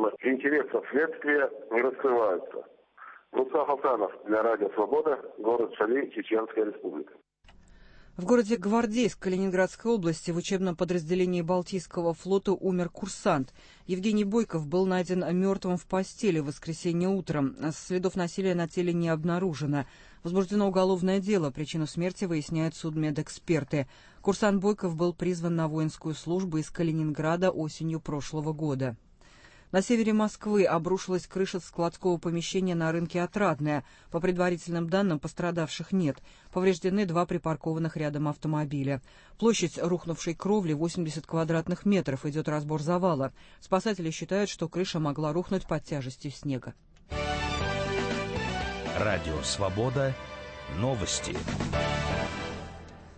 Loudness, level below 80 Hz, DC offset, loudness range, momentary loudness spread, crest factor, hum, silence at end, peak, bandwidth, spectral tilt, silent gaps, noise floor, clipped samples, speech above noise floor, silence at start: -29 LUFS; -52 dBFS; under 0.1%; 3 LU; 8 LU; 18 dB; none; 0.05 s; -10 dBFS; 8.8 kHz; -6 dB/octave; none; -56 dBFS; under 0.1%; 28 dB; 0 s